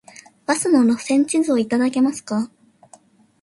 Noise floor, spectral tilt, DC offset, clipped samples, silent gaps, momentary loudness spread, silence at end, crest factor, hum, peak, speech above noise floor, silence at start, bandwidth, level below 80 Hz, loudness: -51 dBFS; -4 dB/octave; under 0.1%; under 0.1%; none; 9 LU; 0.95 s; 16 dB; none; -4 dBFS; 33 dB; 0.5 s; 11.5 kHz; -66 dBFS; -19 LUFS